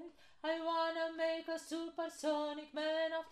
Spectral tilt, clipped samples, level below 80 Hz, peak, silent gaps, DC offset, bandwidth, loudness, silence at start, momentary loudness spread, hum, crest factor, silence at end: -1.5 dB/octave; under 0.1%; -80 dBFS; -24 dBFS; none; under 0.1%; 14 kHz; -39 LUFS; 0 s; 7 LU; none; 14 dB; 0 s